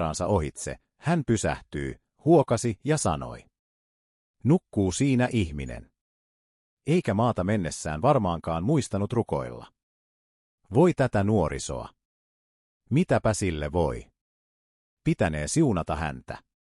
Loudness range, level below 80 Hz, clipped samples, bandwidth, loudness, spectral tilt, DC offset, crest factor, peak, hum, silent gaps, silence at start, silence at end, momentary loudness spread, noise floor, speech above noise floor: 2 LU; -48 dBFS; under 0.1%; 12 kHz; -26 LUFS; -6 dB/octave; under 0.1%; 18 dB; -8 dBFS; none; 3.59-4.34 s, 6.01-6.77 s, 9.83-10.58 s, 12.05-12.80 s, 14.21-14.97 s; 0 s; 0.3 s; 15 LU; under -90 dBFS; over 65 dB